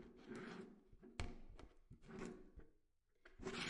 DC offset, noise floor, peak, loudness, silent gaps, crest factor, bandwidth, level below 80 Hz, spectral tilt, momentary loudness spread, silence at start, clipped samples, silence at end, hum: under 0.1%; -78 dBFS; -30 dBFS; -56 LUFS; none; 24 dB; 11 kHz; -62 dBFS; -4.5 dB/octave; 13 LU; 0 s; under 0.1%; 0 s; none